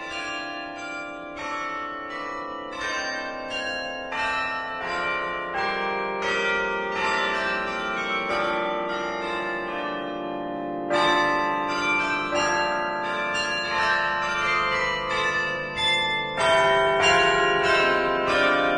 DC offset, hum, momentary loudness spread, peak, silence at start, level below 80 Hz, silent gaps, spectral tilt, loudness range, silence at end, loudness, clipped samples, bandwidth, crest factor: under 0.1%; none; 11 LU; -8 dBFS; 0 s; -52 dBFS; none; -3 dB/octave; 8 LU; 0 s; -24 LUFS; under 0.1%; 11.5 kHz; 18 dB